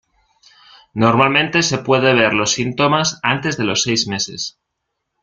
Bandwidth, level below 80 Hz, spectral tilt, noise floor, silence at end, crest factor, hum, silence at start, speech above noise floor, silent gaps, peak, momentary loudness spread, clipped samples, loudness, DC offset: 10 kHz; -54 dBFS; -3.5 dB/octave; -76 dBFS; 0.75 s; 16 dB; none; 0.95 s; 59 dB; none; 0 dBFS; 8 LU; under 0.1%; -16 LUFS; under 0.1%